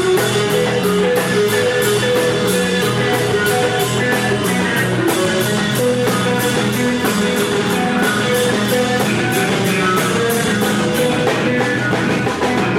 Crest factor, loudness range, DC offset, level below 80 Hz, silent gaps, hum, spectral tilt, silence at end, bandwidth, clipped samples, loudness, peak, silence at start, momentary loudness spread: 12 dB; 1 LU; under 0.1%; -46 dBFS; none; none; -4.5 dB/octave; 0 s; 16.5 kHz; under 0.1%; -16 LUFS; -4 dBFS; 0 s; 1 LU